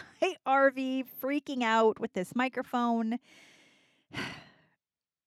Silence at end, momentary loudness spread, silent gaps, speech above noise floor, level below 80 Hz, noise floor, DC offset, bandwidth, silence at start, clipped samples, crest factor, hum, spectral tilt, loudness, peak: 0.85 s; 14 LU; none; over 60 dB; -74 dBFS; under -90 dBFS; under 0.1%; 15 kHz; 0 s; under 0.1%; 18 dB; none; -5 dB/octave; -30 LUFS; -14 dBFS